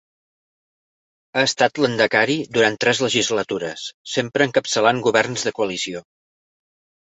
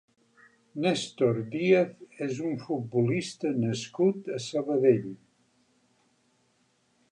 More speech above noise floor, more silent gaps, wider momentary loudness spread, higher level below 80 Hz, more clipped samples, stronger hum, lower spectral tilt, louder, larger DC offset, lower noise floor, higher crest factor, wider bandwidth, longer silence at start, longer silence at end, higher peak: first, over 70 dB vs 42 dB; first, 3.94-4.05 s vs none; about the same, 9 LU vs 11 LU; first, -62 dBFS vs -72 dBFS; neither; neither; second, -3 dB/octave vs -6 dB/octave; first, -19 LUFS vs -28 LUFS; neither; first, under -90 dBFS vs -70 dBFS; about the same, 20 dB vs 20 dB; second, 8.4 kHz vs 10.5 kHz; first, 1.35 s vs 0.75 s; second, 1 s vs 1.95 s; first, -2 dBFS vs -10 dBFS